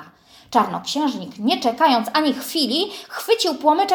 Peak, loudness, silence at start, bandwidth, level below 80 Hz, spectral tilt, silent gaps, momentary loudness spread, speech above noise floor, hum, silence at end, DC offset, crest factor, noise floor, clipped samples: -2 dBFS; -20 LUFS; 0 s; 18 kHz; -68 dBFS; -3.5 dB/octave; none; 7 LU; 28 dB; none; 0 s; under 0.1%; 18 dB; -47 dBFS; under 0.1%